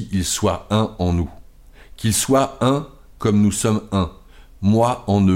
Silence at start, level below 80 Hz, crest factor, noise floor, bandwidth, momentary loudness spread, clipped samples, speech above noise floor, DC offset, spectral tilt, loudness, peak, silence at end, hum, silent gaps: 0 s; -40 dBFS; 14 dB; -44 dBFS; 16.5 kHz; 7 LU; under 0.1%; 26 dB; under 0.1%; -5.5 dB/octave; -20 LUFS; -6 dBFS; 0 s; none; none